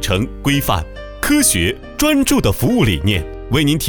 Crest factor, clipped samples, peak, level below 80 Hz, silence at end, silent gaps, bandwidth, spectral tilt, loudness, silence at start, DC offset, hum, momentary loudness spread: 14 dB; under 0.1%; -2 dBFS; -30 dBFS; 0 s; none; over 20 kHz; -4 dB/octave; -16 LUFS; 0 s; under 0.1%; none; 8 LU